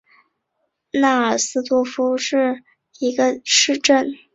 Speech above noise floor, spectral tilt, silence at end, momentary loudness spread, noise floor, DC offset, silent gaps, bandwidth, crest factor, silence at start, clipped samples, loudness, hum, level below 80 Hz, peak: 55 dB; -1 dB/octave; 0.2 s; 8 LU; -73 dBFS; under 0.1%; none; 8 kHz; 18 dB; 0.95 s; under 0.1%; -18 LUFS; none; -66 dBFS; -2 dBFS